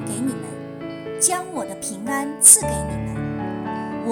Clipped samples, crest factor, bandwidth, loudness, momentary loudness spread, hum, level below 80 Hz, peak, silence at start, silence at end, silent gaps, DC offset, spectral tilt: under 0.1%; 22 dB; 19.5 kHz; -18 LUFS; 22 LU; none; -44 dBFS; 0 dBFS; 0 s; 0 s; none; under 0.1%; -3 dB/octave